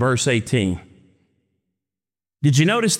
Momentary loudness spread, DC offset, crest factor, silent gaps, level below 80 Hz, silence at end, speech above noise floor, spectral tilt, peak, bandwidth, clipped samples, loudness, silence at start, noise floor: 8 LU; under 0.1%; 16 dB; none; -56 dBFS; 0 s; over 72 dB; -5 dB/octave; -4 dBFS; 16 kHz; under 0.1%; -19 LUFS; 0 s; under -90 dBFS